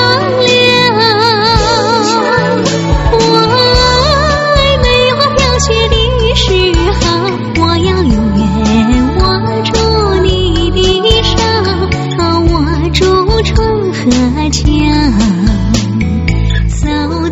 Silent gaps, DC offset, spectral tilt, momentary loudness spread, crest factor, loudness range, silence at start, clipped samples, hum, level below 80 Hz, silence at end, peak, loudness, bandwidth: none; under 0.1%; -5 dB/octave; 5 LU; 10 dB; 2 LU; 0 s; 0.2%; none; -18 dBFS; 0 s; 0 dBFS; -10 LUFS; 8.8 kHz